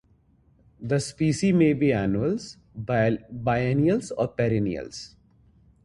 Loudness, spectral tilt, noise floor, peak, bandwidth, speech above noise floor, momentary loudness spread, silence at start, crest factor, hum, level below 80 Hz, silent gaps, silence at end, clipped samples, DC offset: -24 LUFS; -7 dB/octave; -61 dBFS; -8 dBFS; 11.5 kHz; 37 dB; 17 LU; 0.8 s; 16 dB; none; -50 dBFS; none; 0.75 s; under 0.1%; under 0.1%